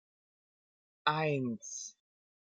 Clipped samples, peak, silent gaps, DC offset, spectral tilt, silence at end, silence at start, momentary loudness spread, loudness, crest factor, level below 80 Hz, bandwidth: under 0.1%; -14 dBFS; none; under 0.1%; -4 dB/octave; 0.7 s; 1.05 s; 12 LU; -35 LUFS; 24 dB; -86 dBFS; 9.4 kHz